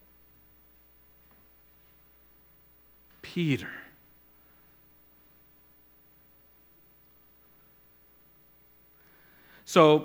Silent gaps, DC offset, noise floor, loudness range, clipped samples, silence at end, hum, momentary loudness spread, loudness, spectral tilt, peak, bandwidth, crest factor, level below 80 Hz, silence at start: none; under 0.1%; -60 dBFS; 19 LU; under 0.1%; 0 s; 60 Hz at -65 dBFS; 33 LU; -27 LUFS; -6 dB/octave; -4 dBFS; 17 kHz; 28 dB; -70 dBFS; 3.25 s